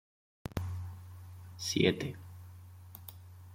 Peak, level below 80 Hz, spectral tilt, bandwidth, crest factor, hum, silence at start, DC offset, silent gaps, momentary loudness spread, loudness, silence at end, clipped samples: -12 dBFS; -62 dBFS; -5 dB/octave; 16.5 kHz; 26 dB; none; 0.45 s; under 0.1%; none; 22 LU; -35 LUFS; 0 s; under 0.1%